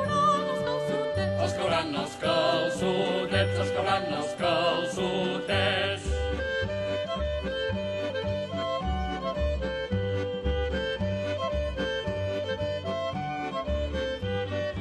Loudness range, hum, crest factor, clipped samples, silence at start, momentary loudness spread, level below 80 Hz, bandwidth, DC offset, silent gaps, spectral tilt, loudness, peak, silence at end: 4 LU; none; 16 dB; under 0.1%; 0 s; 6 LU; -40 dBFS; 12 kHz; under 0.1%; none; -5.5 dB/octave; -29 LUFS; -12 dBFS; 0 s